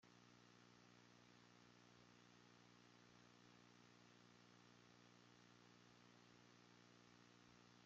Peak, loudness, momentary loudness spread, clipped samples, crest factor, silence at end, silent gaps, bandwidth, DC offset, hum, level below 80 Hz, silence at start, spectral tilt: -56 dBFS; -70 LUFS; 0 LU; under 0.1%; 14 dB; 0 s; none; 7.4 kHz; under 0.1%; 60 Hz at -75 dBFS; under -90 dBFS; 0 s; -3.5 dB/octave